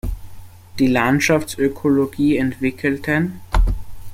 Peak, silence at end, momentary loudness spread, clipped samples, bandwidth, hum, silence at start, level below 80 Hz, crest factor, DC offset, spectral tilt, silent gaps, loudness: -2 dBFS; 0 s; 12 LU; under 0.1%; 16.5 kHz; none; 0.05 s; -26 dBFS; 16 dB; under 0.1%; -6 dB/octave; none; -19 LUFS